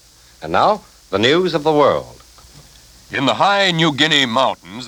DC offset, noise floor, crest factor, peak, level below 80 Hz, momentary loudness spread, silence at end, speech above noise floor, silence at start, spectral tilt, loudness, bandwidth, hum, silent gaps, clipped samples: under 0.1%; -45 dBFS; 18 dB; 0 dBFS; -50 dBFS; 11 LU; 0 s; 29 dB; 0.4 s; -4.5 dB/octave; -16 LUFS; over 20 kHz; none; none; under 0.1%